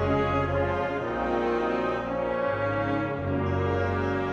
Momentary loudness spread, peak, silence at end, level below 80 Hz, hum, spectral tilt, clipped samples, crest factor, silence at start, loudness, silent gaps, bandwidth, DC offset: 3 LU; -12 dBFS; 0 s; -46 dBFS; none; -8 dB/octave; under 0.1%; 14 dB; 0 s; -27 LUFS; none; 7.4 kHz; under 0.1%